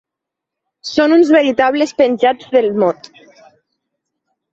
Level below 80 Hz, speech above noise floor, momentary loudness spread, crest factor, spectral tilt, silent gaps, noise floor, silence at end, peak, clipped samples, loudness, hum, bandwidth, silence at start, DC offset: -60 dBFS; 69 dB; 9 LU; 14 dB; -5 dB/octave; none; -82 dBFS; 1.6 s; -2 dBFS; under 0.1%; -13 LUFS; none; 7.8 kHz; 0.85 s; under 0.1%